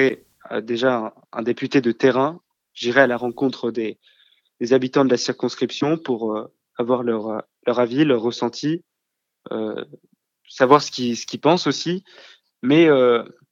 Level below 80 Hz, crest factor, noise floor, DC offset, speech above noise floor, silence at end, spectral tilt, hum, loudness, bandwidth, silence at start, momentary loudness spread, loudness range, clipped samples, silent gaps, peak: -74 dBFS; 20 dB; -79 dBFS; under 0.1%; 60 dB; 0.25 s; -5.5 dB/octave; none; -20 LUFS; 7.6 kHz; 0 s; 14 LU; 4 LU; under 0.1%; none; 0 dBFS